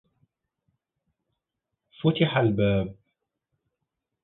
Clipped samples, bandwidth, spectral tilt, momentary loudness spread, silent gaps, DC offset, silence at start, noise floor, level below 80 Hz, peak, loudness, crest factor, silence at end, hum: under 0.1%; 4.2 kHz; -11 dB/octave; 6 LU; none; under 0.1%; 2 s; -84 dBFS; -54 dBFS; -8 dBFS; -24 LUFS; 22 dB; 1.3 s; none